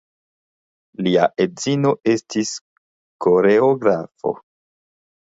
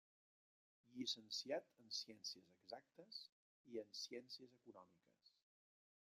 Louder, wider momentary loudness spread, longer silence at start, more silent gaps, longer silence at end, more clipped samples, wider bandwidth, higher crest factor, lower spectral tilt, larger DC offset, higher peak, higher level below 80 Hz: first, -19 LUFS vs -51 LUFS; second, 12 LU vs 18 LU; first, 1 s vs 0.85 s; first, 2.61-3.19 s vs 3.32-3.64 s; about the same, 0.85 s vs 0.85 s; neither; second, 8 kHz vs 15.5 kHz; about the same, 18 dB vs 22 dB; first, -5.5 dB/octave vs -2 dB/octave; neither; first, -2 dBFS vs -32 dBFS; first, -62 dBFS vs under -90 dBFS